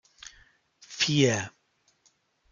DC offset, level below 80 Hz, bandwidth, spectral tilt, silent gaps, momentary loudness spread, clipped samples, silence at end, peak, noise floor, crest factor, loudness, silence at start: under 0.1%; -68 dBFS; 9.4 kHz; -4 dB/octave; none; 25 LU; under 0.1%; 1.05 s; -8 dBFS; -70 dBFS; 24 dB; -25 LUFS; 0.25 s